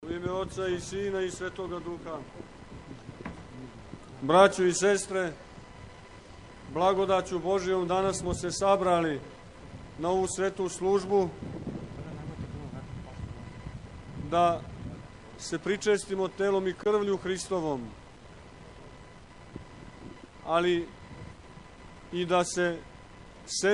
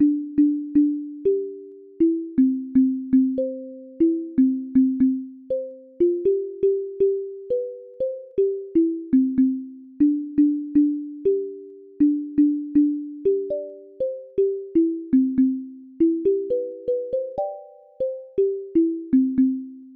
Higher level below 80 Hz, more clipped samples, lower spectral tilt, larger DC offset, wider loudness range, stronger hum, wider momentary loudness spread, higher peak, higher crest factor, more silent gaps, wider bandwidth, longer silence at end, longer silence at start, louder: first, -52 dBFS vs -58 dBFS; neither; second, -4.5 dB/octave vs -10.5 dB/octave; neither; first, 8 LU vs 3 LU; neither; first, 23 LU vs 10 LU; first, -6 dBFS vs -10 dBFS; first, 24 dB vs 12 dB; neither; first, 11.5 kHz vs 2.6 kHz; about the same, 0 s vs 0 s; about the same, 0 s vs 0 s; second, -29 LUFS vs -23 LUFS